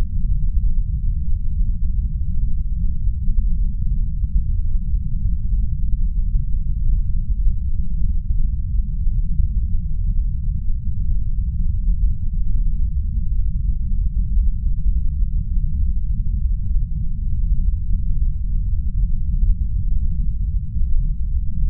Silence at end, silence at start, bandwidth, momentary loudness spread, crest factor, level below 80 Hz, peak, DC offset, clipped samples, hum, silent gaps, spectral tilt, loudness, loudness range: 0 s; 0 s; 0.2 kHz; 3 LU; 12 dB; -18 dBFS; -6 dBFS; under 0.1%; under 0.1%; none; none; -27.5 dB/octave; -24 LUFS; 1 LU